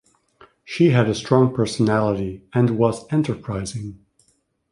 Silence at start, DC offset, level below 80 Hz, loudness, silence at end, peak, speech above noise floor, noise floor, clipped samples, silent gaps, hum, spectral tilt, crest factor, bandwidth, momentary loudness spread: 0.7 s; under 0.1%; -50 dBFS; -20 LUFS; 0.75 s; -2 dBFS; 46 dB; -65 dBFS; under 0.1%; none; none; -7 dB/octave; 20 dB; 11 kHz; 12 LU